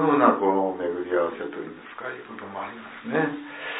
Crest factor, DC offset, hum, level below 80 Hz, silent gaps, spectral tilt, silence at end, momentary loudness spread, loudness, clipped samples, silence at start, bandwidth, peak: 20 dB; under 0.1%; none; -72 dBFS; none; -10 dB/octave; 0 s; 17 LU; -26 LUFS; under 0.1%; 0 s; 4 kHz; -4 dBFS